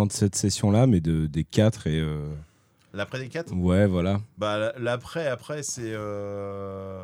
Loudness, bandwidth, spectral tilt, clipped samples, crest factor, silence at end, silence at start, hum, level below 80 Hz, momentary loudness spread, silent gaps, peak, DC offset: -26 LUFS; 16.5 kHz; -6 dB/octave; under 0.1%; 20 dB; 0 s; 0 s; none; -46 dBFS; 13 LU; none; -6 dBFS; under 0.1%